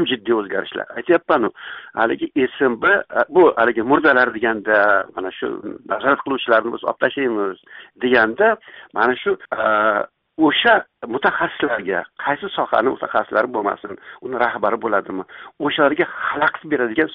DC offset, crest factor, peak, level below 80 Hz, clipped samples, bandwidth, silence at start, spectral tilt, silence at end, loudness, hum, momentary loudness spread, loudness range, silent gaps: under 0.1%; 16 dB; -2 dBFS; -60 dBFS; under 0.1%; 5.4 kHz; 0 s; -1.5 dB/octave; 0 s; -18 LUFS; none; 12 LU; 5 LU; none